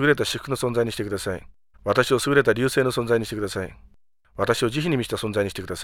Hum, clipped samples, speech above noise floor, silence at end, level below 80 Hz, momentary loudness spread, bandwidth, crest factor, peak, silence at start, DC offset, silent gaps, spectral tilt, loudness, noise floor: none; under 0.1%; 33 dB; 0 s; -50 dBFS; 12 LU; 17.5 kHz; 20 dB; -4 dBFS; 0 s; under 0.1%; none; -5 dB/octave; -23 LUFS; -56 dBFS